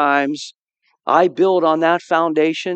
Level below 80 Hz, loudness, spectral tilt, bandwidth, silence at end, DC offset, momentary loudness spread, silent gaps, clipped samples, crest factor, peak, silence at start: -68 dBFS; -16 LUFS; -5 dB/octave; 8.8 kHz; 0 s; under 0.1%; 13 LU; 0.62-0.67 s; under 0.1%; 16 dB; 0 dBFS; 0 s